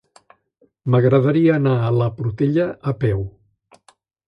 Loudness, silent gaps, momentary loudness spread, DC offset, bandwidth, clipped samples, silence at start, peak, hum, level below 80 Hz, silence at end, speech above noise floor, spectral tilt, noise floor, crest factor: -18 LUFS; none; 9 LU; under 0.1%; 5.2 kHz; under 0.1%; 0.85 s; -4 dBFS; none; -48 dBFS; 1 s; 44 dB; -10 dB/octave; -61 dBFS; 16 dB